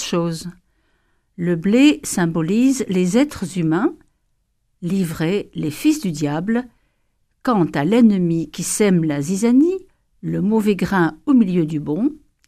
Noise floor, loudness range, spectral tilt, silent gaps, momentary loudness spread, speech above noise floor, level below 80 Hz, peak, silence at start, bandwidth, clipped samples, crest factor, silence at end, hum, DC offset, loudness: -67 dBFS; 4 LU; -6 dB/octave; none; 10 LU; 49 dB; -52 dBFS; -2 dBFS; 0 s; 15.5 kHz; under 0.1%; 16 dB; 0.3 s; none; under 0.1%; -18 LUFS